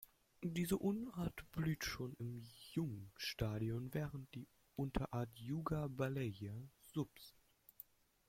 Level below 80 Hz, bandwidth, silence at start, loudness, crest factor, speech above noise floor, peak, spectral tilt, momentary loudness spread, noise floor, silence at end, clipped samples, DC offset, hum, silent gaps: -62 dBFS; 16.5 kHz; 0 s; -44 LUFS; 20 dB; 21 dB; -26 dBFS; -6 dB/octave; 14 LU; -64 dBFS; 1 s; under 0.1%; under 0.1%; none; none